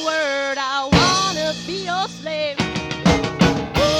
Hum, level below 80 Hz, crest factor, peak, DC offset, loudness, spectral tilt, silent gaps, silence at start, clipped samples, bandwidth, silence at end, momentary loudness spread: none; -36 dBFS; 18 dB; -2 dBFS; under 0.1%; -19 LUFS; -4 dB/octave; none; 0 s; under 0.1%; 16.5 kHz; 0 s; 8 LU